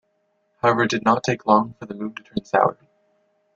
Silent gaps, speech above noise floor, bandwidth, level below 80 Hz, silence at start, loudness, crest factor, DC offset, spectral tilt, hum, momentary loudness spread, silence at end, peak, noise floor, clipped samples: none; 48 dB; 8 kHz; -62 dBFS; 0.65 s; -21 LUFS; 20 dB; under 0.1%; -5.5 dB/octave; none; 13 LU; 0.85 s; -2 dBFS; -69 dBFS; under 0.1%